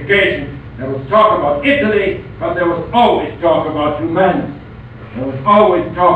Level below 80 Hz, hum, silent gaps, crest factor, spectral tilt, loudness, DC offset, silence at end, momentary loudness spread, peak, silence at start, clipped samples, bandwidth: -38 dBFS; none; none; 14 dB; -8 dB/octave; -14 LUFS; 0.2%; 0 s; 16 LU; 0 dBFS; 0 s; under 0.1%; 8.4 kHz